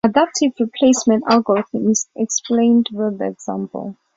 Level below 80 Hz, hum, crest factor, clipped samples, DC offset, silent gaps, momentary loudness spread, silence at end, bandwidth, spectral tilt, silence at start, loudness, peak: -60 dBFS; none; 16 dB; under 0.1%; under 0.1%; none; 11 LU; 0.25 s; 7.8 kHz; -4 dB/octave; 0.05 s; -17 LUFS; -2 dBFS